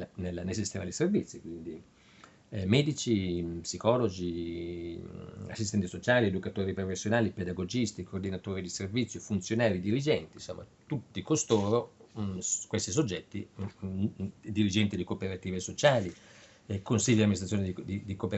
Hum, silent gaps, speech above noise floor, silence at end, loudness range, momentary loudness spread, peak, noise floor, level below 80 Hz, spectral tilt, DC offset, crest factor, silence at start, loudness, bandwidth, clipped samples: none; none; 26 dB; 0 s; 2 LU; 15 LU; -8 dBFS; -58 dBFS; -60 dBFS; -5 dB/octave; under 0.1%; 24 dB; 0 s; -31 LUFS; 8.4 kHz; under 0.1%